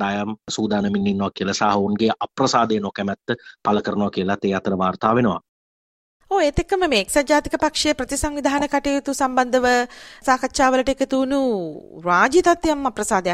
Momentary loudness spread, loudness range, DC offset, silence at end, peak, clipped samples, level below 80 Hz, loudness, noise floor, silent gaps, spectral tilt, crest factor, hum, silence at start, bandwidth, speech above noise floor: 7 LU; 3 LU; under 0.1%; 0 s; -2 dBFS; under 0.1%; -42 dBFS; -20 LUFS; under -90 dBFS; 5.49-6.20 s; -4.5 dB/octave; 18 dB; none; 0 s; 15 kHz; over 70 dB